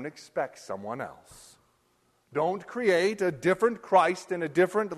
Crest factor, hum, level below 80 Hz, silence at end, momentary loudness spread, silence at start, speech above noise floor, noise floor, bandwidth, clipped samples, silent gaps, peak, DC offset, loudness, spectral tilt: 18 dB; none; -70 dBFS; 0 s; 13 LU; 0 s; 42 dB; -69 dBFS; 13 kHz; under 0.1%; none; -10 dBFS; under 0.1%; -27 LUFS; -5.5 dB/octave